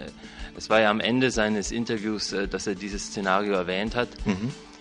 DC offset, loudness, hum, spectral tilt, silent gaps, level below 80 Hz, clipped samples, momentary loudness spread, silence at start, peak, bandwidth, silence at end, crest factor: under 0.1%; -26 LUFS; none; -4 dB/octave; none; -44 dBFS; under 0.1%; 11 LU; 0 s; -6 dBFS; 11 kHz; 0 s; 22 dB